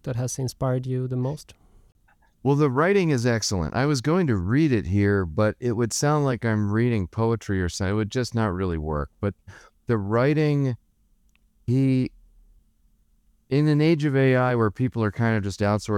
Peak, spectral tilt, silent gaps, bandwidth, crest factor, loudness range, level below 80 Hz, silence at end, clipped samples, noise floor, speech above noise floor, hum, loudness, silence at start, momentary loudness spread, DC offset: -8 dBFS; -6.5 dB/octave; none; 14.5 kHz; 16 dB; 4 LU; -46 dBFS; 0 s; under 0.1%; -63 dBFS; 40 dB; none; -23 LUFS; 0.05 s; 8 LU; under 0.1%